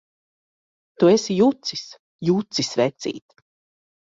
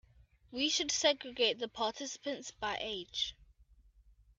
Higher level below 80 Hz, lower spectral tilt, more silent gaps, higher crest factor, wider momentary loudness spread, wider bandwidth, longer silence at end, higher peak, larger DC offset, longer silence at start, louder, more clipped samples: about the same, -64 dBFS vs -66 dBFS; first, -5 dB/octave vs -1 dB/octave; first, 1.99-2.19 s vs none; about the same, 18 dB vs 22 dB; first, 15 LU vs 10 LU; about the same, 7.8 kHz vs 8.4 kHz; first, 0.9 s vs 0.75 s; first, -4 dBFS vs -16 dBFS; neither; first, 1 s vs 0.5 s; first, -21 LUFS vs -34 LUFS; neither